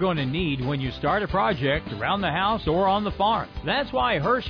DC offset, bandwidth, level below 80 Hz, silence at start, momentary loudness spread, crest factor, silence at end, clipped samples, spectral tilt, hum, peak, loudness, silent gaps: under 0.1%; 5.4 kHz; -40 dBFS; 0 s; 4 LU; 12 dB; 0 s; under 0.1%; -8 dB/octave; none; -12 dBFS; -24 LUFS; none